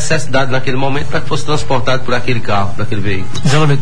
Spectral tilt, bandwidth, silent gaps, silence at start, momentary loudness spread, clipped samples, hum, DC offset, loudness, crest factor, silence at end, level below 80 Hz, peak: -5 dB/octave; 10.5 kHz; none; 0 s; 5 LU; under 0.1%; none; 30%; -16 LUFS; 14 dB; 0 s; -34 dBFS; 0 dBFS